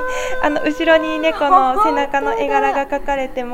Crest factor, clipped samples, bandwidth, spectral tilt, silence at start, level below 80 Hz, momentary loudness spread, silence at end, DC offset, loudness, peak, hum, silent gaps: 16 dB; under 0.1%; 16 kHz; -3.5 dB/octave; 0 s; -36 dBFS; 7 LU; 0 s; under 0.1%; -16 LUFS; 0 dBFS; none; none